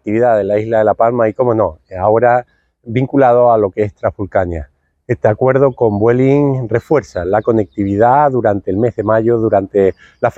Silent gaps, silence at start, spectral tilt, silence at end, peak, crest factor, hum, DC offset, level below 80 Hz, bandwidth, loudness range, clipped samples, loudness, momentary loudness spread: none; 0.05 s; -9.5 dB/octave; 0.05 s; 0 dBFS; 14 dB; none; under 0.1%; -44 dBFS; 8 kHz; 1 LU; under 0.1%; -13 LUFS; 7 LU